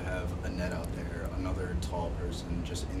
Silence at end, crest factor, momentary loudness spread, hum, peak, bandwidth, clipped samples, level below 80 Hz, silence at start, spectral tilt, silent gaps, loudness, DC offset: 0 s; 12 dB; 3 LU; none; -22 dBFS; 14.5 kHz; under 0.1%; -38 dBFS; 0 s; -6 dB/octave; none; -36 LUFS; under 0.1%